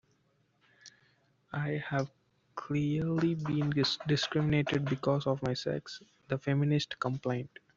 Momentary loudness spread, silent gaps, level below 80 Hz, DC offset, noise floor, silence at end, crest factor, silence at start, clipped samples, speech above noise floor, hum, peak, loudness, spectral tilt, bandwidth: 10 LU; none; -64 dBFS; under 0.1%; -72 dBFS; 0.3 s; 18 dB; 0.85 s; under 0.1%; 41 dB; none; -16 dBFS; -32 LUFS; -6.5 dB/octave; 7.6 kHz